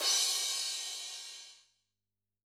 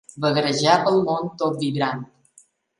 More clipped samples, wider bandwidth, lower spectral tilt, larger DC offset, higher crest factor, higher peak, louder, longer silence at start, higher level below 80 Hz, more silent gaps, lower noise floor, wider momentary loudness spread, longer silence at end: neither; first, 19.5 kHz vs 11.5 kHz; second, 5 dB/octave vs -5 dB/octave; neither; about the same, 20 dB vs 20 dB; second, -18 dBFS vs -2 dBFS; second, -32 LUFS vs -21 LUFS; second, 0 s vs 0.15 s; second, under -90 dBFS vs -66 dBFS; neither; first, under -90 dBFS vs -57 dBFS; first, 20 LU vs 8 LU; first, 0.9 s vs 0.75 s